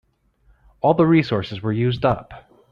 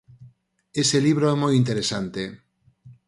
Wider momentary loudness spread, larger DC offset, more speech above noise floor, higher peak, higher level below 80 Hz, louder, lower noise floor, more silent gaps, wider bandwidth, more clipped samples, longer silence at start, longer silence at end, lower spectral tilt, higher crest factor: second, 9 LU vs 12 LU; neither; first, 40 dB vs 33 dB; first, -2 dBFS vs -8 dBFS; first, -48 dBFS vs -58 dBFS; about the same, -20 LUFS vs -22 LUFS; first, -59 dBFS vs -54 dBFS; neither; second, 6.6 kHz vs 11.5 kHz; neither; first, 0.85 s vs 0.2 s; first, 0.35 s vs 0.15 s; first, -9 dB/octave vs -5 dB/octave; about the same, 18 dB vs 16 dB